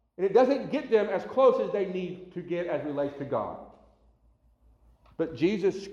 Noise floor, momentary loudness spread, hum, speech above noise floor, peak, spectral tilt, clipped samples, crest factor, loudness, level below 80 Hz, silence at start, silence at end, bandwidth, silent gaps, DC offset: -64 dBFS; 14 LU; none; 37 dB; -10 dBFS; -7 dB/octave; under 0.1%; 18 dB; -28 LUFS; -64 dBFS; 0.2 s; 0 s; 7.4 kHz; none; under 0.1%